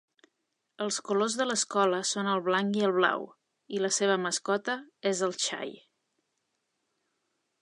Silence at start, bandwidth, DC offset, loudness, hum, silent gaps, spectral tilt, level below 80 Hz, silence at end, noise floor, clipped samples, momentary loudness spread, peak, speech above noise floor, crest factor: 0.8 s; 11.5 kHz; under 0.1%; -29 LUFS; none; none; -3 dB/octave; -84 dBFS; 1.85 s; -81 dBFS; under 0.1%; 10 LU; -8 dBFS; 52 dB; 22 dB